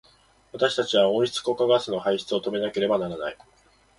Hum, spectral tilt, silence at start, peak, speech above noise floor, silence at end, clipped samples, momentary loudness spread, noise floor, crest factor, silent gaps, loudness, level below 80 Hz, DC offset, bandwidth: none; -4.5 dB/octave; 0.55 s; -8 dBFS; 35 dB; 0.65 s; under 0.1%; 10 LU; -59 dBFS; 18 dB; none; -24 LUFS; -64 dBFS; under 0.1%; 11.5 kHz